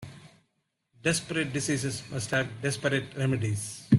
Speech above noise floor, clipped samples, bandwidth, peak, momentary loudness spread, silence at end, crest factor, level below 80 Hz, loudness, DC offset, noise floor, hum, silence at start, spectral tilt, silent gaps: 48 dB; under 0.1%; 12.5 kHz; -8 dBFS; 5 LU; 0 s; 20 dB; -62 dBFS; -30 LUFS; under 0.1%; -77 dBFS; none; 0 s; -5 dB/octave; none